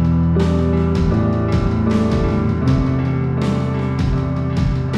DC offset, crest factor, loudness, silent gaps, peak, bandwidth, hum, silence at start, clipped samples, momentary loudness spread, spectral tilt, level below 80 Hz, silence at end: under 0.1%; 12 dB; -18 LUFS; none; -4 dBFS; 8.8 kHz; none; 0 s; under 0.1%; 3 LU; -8.5 dB/octave; -26 dBFS; 0 s